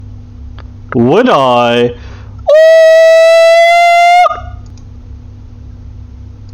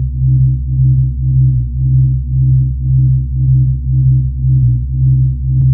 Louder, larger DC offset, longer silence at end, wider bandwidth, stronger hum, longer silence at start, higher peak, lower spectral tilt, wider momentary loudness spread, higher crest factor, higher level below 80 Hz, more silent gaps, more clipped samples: first, -6 LUFS vs -13 LUFS; neither; about the same, 0 s vs 0 s; first, 13 kHz vs 0.5 kHz; neither; about the same, 0 s vs 0 s; about the same, 0 dBFS vs -2 dBFS; second, -5 dB/octave vs -18.5 dB/octave; first, 14 LU vs 2 LU; about the same, 8 dB vs 8 dB; second, -32 dBFS vs -18 dBFS; neither; first, 2% vs under 0.1%